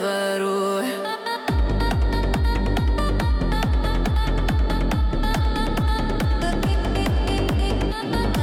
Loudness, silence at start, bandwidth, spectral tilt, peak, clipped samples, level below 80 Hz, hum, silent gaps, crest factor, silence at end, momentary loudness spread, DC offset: -23 LUFS; 0 s; 16 kHz; -6 dB/octave; -10 dBFS; under 0.1%; -24 dBFS; none; none; 10 dB; 0 s; 2 LU; under 0.1%